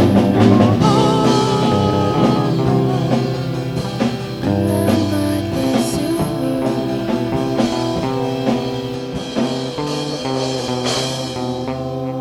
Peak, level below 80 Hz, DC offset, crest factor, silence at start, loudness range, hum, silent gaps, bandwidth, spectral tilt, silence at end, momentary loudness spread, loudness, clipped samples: 0 dBFS; -42 dBFS; under 0.1%; 16 dB; 0 s; 6 LU; none; none; 16.5 kHz; -6.5 dB/octave; 0 s; 9 LU; -18 LUFS; under 0.1%